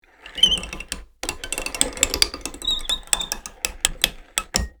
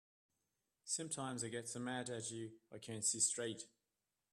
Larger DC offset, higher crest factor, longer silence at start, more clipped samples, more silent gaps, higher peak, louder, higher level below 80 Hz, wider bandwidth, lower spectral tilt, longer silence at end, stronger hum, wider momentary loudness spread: neither; about the same, 26 dB vs 24 dB; second, 0.25 s vs 0.85 s; neither; neither; first, 0 dBFS vs -22 dBFS; first, -22 LUFS vs -41 LUFS; first, -38 dBFS vs -84 dBFS; first, over 20 kHz vs 14 kHz; second, -0.5 dB/octave vs -2.5 dB/octave; second, 0.1 s vs 0.65 s; neither; second, 13 LU vs 17 LU